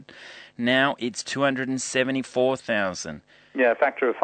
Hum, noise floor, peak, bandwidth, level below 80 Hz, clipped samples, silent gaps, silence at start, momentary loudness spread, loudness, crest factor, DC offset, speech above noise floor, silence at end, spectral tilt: none; -45 dBFS; -6 dBFS; 9.2 kHz; -66 dBFS; under 0.1%; none; 0 s; 17 LU; -24 LUFS; 18 dB; under 0.1%; 21 dB; 0 s; -3.5 dB/octave